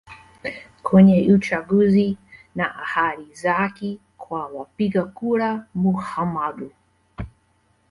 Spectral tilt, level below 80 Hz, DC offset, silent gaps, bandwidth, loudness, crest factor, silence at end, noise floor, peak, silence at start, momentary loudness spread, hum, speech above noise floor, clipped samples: -8 dB/octave; -50 dBFS; under 0.1%; none; 11 kHz; -20 LUFS; 18 dB; 0.6 s; -63 dBFS; -2 dBFS; 0.1 s; 20 LU; none; 43 dB; under 0.1%